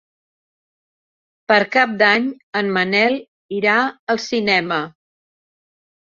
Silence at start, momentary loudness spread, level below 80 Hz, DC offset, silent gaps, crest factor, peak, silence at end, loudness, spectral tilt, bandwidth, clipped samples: 1.5 s; 9 LU; -66 dBFS; under 0.1%; 2.43-2.53 s, 3.28-3.49 s, 3.99-4.07 s; 20 dB; 0 dBFS; 1.25 s; -17 LUFS; -4.5 dB/octave; 7.4 kHz; under 0.1%